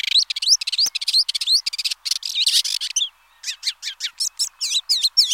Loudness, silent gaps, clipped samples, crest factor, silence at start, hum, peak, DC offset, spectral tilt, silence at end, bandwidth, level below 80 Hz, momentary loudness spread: -18 LUFS; none; under 0.1%; 18 dB; 0.15 s; none; -4 dBFS; under 0.1%; 6.5 dB/octave; 0 s; 16.5 kHz; -72 dBFS; 9 LU